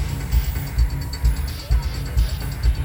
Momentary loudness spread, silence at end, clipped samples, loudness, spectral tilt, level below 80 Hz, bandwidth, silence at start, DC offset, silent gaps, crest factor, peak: 2 LU; 0 s; under 0.1%; -24 LUFS; -5.5 dB/octave; -22 dBFS; 17 kHz; 0 s; under 0.1%; none; 14 dB; -8 dBFS